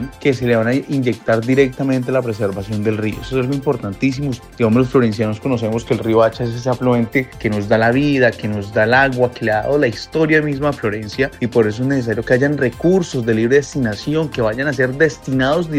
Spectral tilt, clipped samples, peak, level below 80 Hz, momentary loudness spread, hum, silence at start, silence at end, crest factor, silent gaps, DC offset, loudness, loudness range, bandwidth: -6.5 dB/octave; under 0.1%; 0 dBFS; -42 dBFS; 7 LU; none; 0 s; 0 s; 16 dB; none; under 0.1%; -17 LUFS; 3 LU; 15.5 kHz